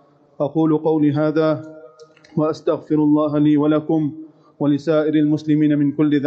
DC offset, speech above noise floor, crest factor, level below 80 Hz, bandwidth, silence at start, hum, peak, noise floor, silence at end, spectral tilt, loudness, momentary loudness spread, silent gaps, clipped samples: under 0.1%; 29 dB; 12 dB; -66 dBFS; 6.4 kHz; 0.4 s; none; -6 dBFS; -46 dBFS; 0 s; -9 dB/octave; -18 LUFS; 9 LU; none; under 0.1%